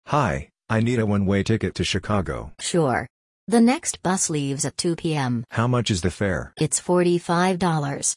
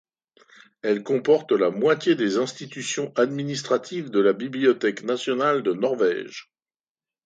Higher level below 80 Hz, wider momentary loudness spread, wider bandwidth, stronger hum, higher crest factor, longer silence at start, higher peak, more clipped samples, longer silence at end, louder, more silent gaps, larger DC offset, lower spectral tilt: first, -46 dBFS vs -74 dBFS; about the same, 6 LU vs 8 LU; first, 11.5 kHz vs 9.2 kHz; neither; about the same, 16 dB vs 18 dB; second, 0.05 s vs 0.85 s; about the same, -6 dBFS vs -6 dBFS; neither; second, 0 s vs 0.85 s; about the same, -23 LUFS vs -23 LUFS; first, 3.10-3.47 s vs none; neither; about the same, -5 dB/octave vs -5 dB/octave